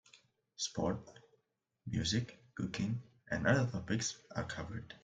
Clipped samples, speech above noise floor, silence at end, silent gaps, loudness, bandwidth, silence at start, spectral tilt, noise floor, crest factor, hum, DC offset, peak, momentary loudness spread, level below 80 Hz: under 0.1%; 46 dB; 0.05 s; none; -38 LUFS; 9.4 kHz; 0.15 s; -4.5 dB/octave; -82 dBFS; 22 dB; none; under 0.1%; -16 dBFS; 12 LU; -62 dBFS